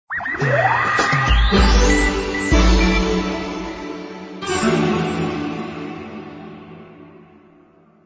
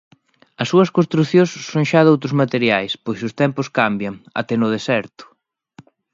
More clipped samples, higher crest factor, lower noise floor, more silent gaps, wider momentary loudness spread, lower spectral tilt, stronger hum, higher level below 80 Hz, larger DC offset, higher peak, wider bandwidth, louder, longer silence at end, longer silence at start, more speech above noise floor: neither; about the same, 16 dB vs 18 dB; about the same, -51 dBFS vs -48 dBFS; neither; first, 18 LU vs 11 LU; second, -5 dB/octave vs -6.5 dB/octave; neither; first, -24 dBFS vs -60 dBFS; neither; about the same, -2 dBFS vs 0 dBFS; about the same, 8 kHz vs 7.6 kHz; about the same, -18 LUFS vs -18 LUFS; about the same, 0.95 s vs 0.9 s; second, 0.1 s vs 0.6 s; first, 36 dB vs 31 dB